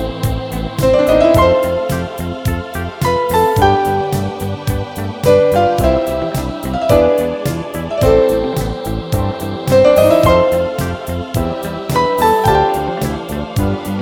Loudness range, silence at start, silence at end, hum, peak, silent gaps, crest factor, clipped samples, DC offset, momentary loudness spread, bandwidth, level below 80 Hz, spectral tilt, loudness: 3 LU; 0 s; 0 s; none; 0 dBFS; none; 14 dB; under 0.1%; 0.1%; 11 LU; 18.5 kHz; -28 dBFS; -6 dB/octave; -15 LUFS